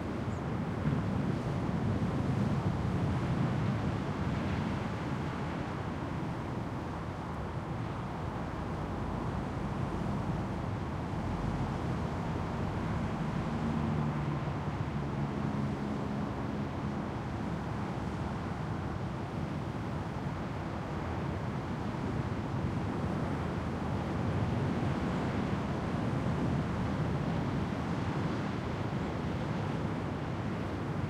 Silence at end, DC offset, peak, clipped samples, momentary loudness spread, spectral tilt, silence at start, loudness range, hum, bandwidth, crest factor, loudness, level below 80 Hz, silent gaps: 0 s; under 0.1%; -18 dBFS; under 0.1%; 5 LU; -7.5 dB/octave; 0 s; 4 LU; none; 11.5 kHz; 14 dB; -35 LUFS; -48 dBFS; none